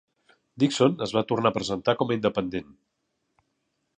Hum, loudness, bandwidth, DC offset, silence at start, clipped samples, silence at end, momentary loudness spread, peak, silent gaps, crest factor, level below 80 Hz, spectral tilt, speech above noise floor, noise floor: none; -25 LUFS; 10 kHz; under 0.1%; 0.55 s; under 0.1%; 1.35 s; 8 LU; -6 dBFS; none; 20 dB; -60 dBFS; -5.5 dB/octave; 52 dB; -77 dBFS